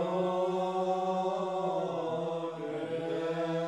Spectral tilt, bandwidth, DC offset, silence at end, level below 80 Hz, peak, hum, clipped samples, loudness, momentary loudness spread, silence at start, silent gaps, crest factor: -7 dB/octave; 11 kHz; under 0.1%; 0 s; -88 dBFS; -20 dBFS; none; under 0.1%; -33 LUFS; 5 LU; 0 s; none; 12 dB